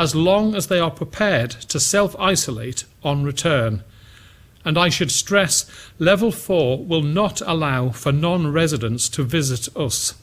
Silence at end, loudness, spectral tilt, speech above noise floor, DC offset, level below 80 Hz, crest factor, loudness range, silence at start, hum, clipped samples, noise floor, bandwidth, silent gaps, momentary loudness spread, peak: 0.1 s; -19 LUFS; -4 dB/octave; 27 dB; under 0.1%; -46 dBFS; 20 dB; 2 LU; 0 s; none; under 0.1%; -47 dBFS; 16.5 kHz; none; 7 LU; 0 dBFS